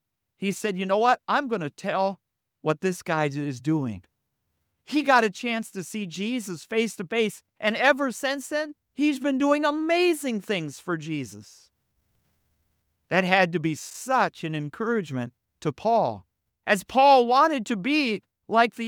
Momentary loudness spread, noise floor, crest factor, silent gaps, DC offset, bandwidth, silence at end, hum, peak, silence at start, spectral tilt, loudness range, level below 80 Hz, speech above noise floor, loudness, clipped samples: 12 LU; -78 dBFS; 22 dB; none; under 0.1%; 19 kHz; 0 s; none; -2 dBFS; 0.4 s; -5 dB/octave; 6 LU; -70 dBFS; 53 dB; -25 LUFS; under 0.1%